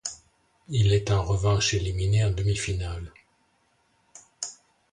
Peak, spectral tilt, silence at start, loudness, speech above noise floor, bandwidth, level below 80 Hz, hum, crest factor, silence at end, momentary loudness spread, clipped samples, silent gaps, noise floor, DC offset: -10 dBFS; -4.5 dB/octave; 0.05 s; -26 LUFS; 44 dB; 10.5 kHz; -40 dBFS; none; 16 dB; 0.4 s; 14 LU; under 0.1%; none; -68 dBFS; under 0.1%